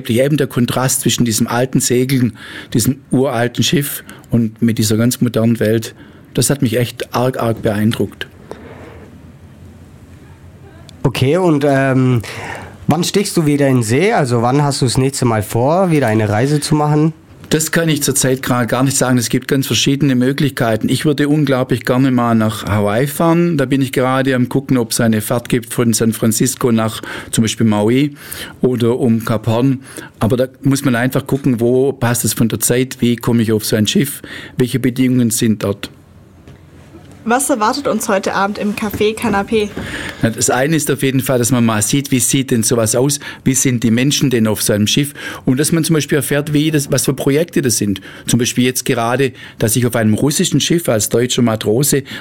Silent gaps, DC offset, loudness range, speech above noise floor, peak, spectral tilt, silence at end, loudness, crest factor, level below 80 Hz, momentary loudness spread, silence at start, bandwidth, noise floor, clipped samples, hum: none; 0.2%; 4 LU; 27 dB; -2 dBFS; -5 dB/octave; 0 s; -15 LUFS; 14 dB; -44 dBFS; 6 LU; 0 s; 17.5 kHz; -42 dBFS; under 0.1%; none